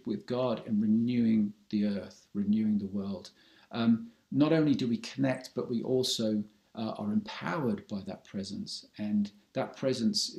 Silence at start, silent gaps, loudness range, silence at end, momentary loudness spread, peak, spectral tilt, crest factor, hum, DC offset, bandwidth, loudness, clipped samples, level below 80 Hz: 0.05 s; none; 5 LU; 0 s; 12 LU; -14 dBFS; -5.5 dB/octave; 18 dB; none; under 0.1%; 12.5 kHz; -32 LUFS; under 0.1%; -70 dBFS